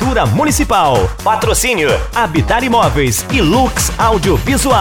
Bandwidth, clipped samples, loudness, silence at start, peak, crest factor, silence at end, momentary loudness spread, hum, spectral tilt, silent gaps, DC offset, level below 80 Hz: 18 kHz; under 0.1%; -12 LUFS; 0 s; 0 dBFS; 12 dB; 0 s; 3 LU; none; -4.5 dB/octave; none; under 0.1%; -22 dBFS